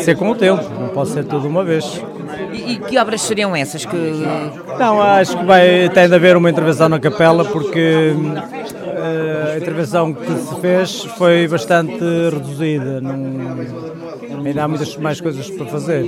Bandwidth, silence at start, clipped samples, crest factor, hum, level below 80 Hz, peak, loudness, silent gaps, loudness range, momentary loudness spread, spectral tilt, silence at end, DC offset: 15.5 kHz; 0 s; under 0.1%; 16 dB; none; -56 dBFS; 0 dBFS; -15 LUFS; none; 8 LU; 14 LU; -5.5 dB/octave; 0 s; under 0.1%